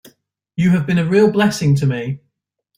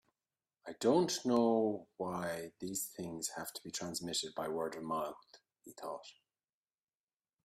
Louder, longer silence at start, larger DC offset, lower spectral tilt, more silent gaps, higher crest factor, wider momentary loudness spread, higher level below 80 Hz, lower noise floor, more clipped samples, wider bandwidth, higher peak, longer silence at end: first, -16 LUFS vs -37 LUFS; about the same, 0.6 s vs 0.65 s; neither; first, -7 dB/octave vs -4 dB/octave; neither; second, 14 dB vs 20 dB; second, 14 LU vs 17 LU; first, -52 dBFS vs -78 dBFS; second, -73 dBFS vs under -90 dBFS; neither; about the same, 15.5 kHz vs 15.5 kHz; first, -2 dBFS vs -18 dBFS; second, 0.6 s vs 1.3 s